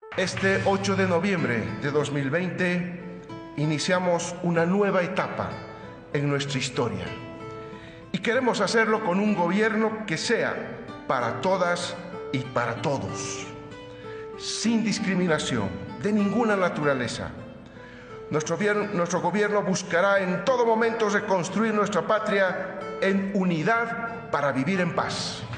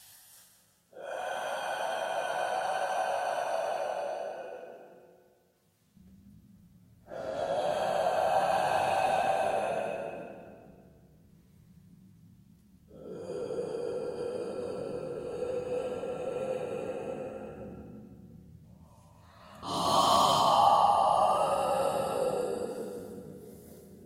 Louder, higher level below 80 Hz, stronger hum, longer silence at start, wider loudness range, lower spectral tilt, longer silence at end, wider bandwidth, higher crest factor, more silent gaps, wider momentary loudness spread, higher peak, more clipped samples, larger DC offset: first, -25 LUFS vs -30 LUFS; first, -58 dBFS vs -64 dBFS; neither; about the same, 0.05 s vs 0 s; second, 5 LU vs 16 LU; first, -5 dB/octave vs -3.5 dB/octave; about the same, 0 s vs 0 s; second, 10 kHz vs 16 kHz; about the same, 16 dB vs 20 dB; neither; second, 15 LU vs 22 LU; about the same, -10 dBFS vs -12 dBFS; neither; neither